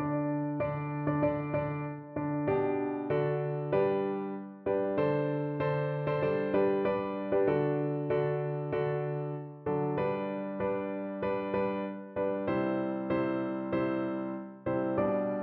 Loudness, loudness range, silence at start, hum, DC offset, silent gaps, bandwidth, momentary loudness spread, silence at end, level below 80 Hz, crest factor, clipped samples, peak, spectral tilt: -32 LUFS; 3 LU; 0 s; none; under 0.1%; none; 4.5 kHz; 7 LU; 0 s; -62 dBFS; 14 dB; under 0.1%; -16 dBFS; -7.5 dB/octave